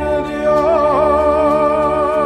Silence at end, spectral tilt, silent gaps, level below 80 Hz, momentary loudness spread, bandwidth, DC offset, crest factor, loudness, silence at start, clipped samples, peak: 0 s; -7 dB/octave; none; -34 dBFS; 3 LU; 11 kHz; under 0.1%; 12 dB; -14 LUFS; 0 s; under 0.1%; -2 dBFS